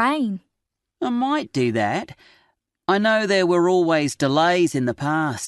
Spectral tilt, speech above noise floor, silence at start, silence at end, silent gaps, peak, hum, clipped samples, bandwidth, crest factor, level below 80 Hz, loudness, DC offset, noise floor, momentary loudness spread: -5 dB/octave; 61 dB; 0 s; 0 s; none; -4 dBFS; none; under 0.1%; 12 kHz; 16 dB; -62 dBFS; -20 LUFS; under 0.1%; -81 dBFS; 10 LU